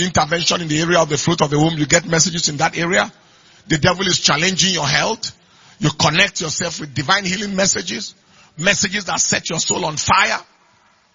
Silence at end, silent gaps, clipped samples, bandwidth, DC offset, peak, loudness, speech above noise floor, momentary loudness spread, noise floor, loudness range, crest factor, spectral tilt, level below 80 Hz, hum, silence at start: 0.75 s; none; under 0.1%; 7.6 kHz; under 0.1%; 0 dBFS; -16 LUFS; 38 dB; 8 LU; -55 dBFS; 2 LU; 18 dB; -3 dB/octave; -46 dBFS; none; 0 s